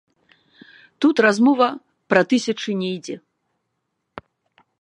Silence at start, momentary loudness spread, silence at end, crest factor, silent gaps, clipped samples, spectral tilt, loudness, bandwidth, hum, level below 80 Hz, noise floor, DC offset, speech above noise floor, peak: 1 s; 17 LU; 0.6 s; 22 dB; none; under 0.1%; -5 dB/octave; -19 LUFS; 10.5 kHz; none; -68 dBFS; -76 dBFS; under 0.1%; 57 dB; 0 dBFS